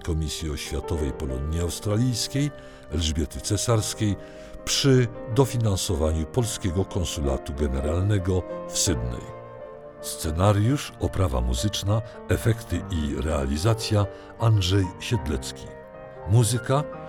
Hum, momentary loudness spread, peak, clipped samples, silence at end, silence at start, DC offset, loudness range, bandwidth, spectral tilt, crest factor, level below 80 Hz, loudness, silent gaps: none; 12 LU; -6 dBFS; under 0.1%; 0 s; 0 s; under 0.1%; 3 LU; 19 kHz; -5 dB/octave; 18 dB; -36 dBFS; -25 LUFS; none